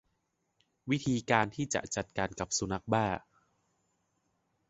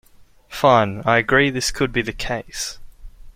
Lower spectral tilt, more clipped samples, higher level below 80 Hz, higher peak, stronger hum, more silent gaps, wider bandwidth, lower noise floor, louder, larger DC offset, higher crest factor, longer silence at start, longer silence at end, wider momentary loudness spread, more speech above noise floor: about the same, -4.5 dB/octave vs -4 dB/octave; neither; second, -60 dBFS vs -40 dBFS; second, -10 dBFS vs -2 dBFS; neither; neither; second, 8.2 kHz vs 16.5 kHz; first, -80 dBFS vs -48 dBFS; second, -32 LUFS vs -19 LUFS; neither; first, 26 dB vs 20 dB; first, 0.85 s vs 0.5 s; first, 1.5 s vs 0.05 s; second, 7 LU vs 12 LU; first, 48 dB vs 29 dB